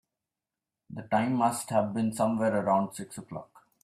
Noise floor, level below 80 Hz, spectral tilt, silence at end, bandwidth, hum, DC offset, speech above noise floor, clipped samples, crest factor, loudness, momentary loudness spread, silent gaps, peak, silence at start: -90 dBFS; -70 dBFS; -6 dB/octave; 0.4 s; 15 kHz; none; under 0.1%; 61 dB; under 0.1%; 18 dB; -28 LUFS; 17 LU; none; -12 dBFS; 0.9 s